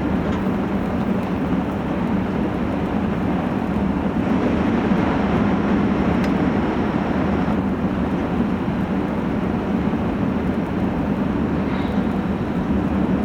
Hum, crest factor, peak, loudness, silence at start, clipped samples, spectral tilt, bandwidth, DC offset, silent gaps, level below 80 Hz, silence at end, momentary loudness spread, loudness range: none; 12 dB; -8 dBFS; -21 LUFS; 0 s; under 0.1%; -8.5 dB/octave; 8.2 kHz; under 0.1%; none; -34 dBFS; 0 s; 3 LU; 2 LU